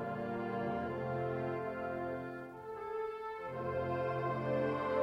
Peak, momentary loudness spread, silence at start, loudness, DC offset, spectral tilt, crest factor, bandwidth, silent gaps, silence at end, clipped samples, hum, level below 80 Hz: -22 dBFS; 8 LU; 0 s; -39 LUFS; under 0.1%; -8.5 dB/octave; 16 dB; 11.5 kHz; none; 0 s; under 0.1%; none; -66 dBFS